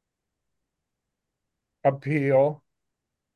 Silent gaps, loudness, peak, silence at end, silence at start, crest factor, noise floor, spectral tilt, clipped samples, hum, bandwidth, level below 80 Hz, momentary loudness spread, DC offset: none; -24 LUFS; -10 dBFS; 0.8 s; 1.85 s; 20 dB; -83 dBFS; -9.5 dB/octave; under 0.1%; none; 5 kHz; -78 dBFS; 5 LU; under 0.1%